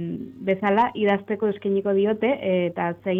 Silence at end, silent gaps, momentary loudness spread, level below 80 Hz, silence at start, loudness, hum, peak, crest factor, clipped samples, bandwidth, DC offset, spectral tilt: 0 s; none; 6 LU; -62 dBFS; 0 s; -23 LUFS; none; -10 dBFS; 12 dB; under 0.1%; 4 kHz; under 0.1%; -9 dB/octave